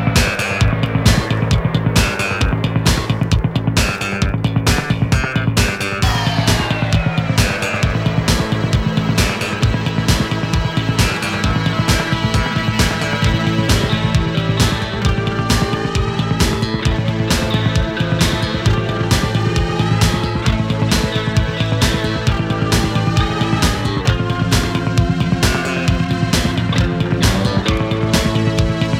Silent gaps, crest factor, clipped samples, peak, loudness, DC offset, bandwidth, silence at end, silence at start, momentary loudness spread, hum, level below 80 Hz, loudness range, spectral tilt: none; 16 dB; under 0.1%; 0 dBFS; -16 LUFS; under 0.1%; 16 kHz; 0 s; 0 s; 2 LU; none; -24 dBFS; 1 LU; -5 dB/octave